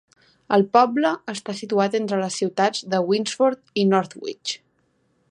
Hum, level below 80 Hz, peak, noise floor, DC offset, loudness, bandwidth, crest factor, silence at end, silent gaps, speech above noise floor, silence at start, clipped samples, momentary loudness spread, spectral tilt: none; -72 dBFS; -2 dBFS; -66 dBFS; under 0.1%; -22 LUFS; 11.5 kHz; 20 dB; 0.75 s; none; 45 dB; 0.5 s; under 0.1%; 12 LU; -5 dB/octave